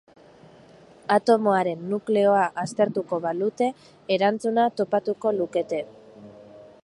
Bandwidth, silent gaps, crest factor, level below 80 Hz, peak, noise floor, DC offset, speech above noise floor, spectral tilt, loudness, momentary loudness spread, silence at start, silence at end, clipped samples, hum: 11.5 kHz; none; 18 dB; -72 dBFS; -6 dBFS; -51 dBFS; under 0.1%; 28 dB; -6 dB/octave; -24 LUFS; 9 LU; 1.1 s; 0.2 s; under 0.1%; none